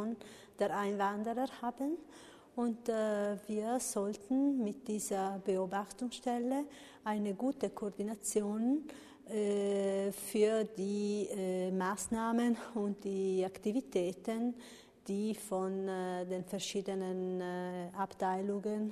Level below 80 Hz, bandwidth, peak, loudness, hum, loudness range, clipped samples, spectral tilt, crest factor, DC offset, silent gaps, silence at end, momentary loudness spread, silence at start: -74 dBFS; 13.5 kHz; -20 dBFS; -37 LUFS; none; 3 LU; under 0.1%; -5 dB/octave; 16 dB; under 0.1%; none; 0 s; 7 LU; 0 s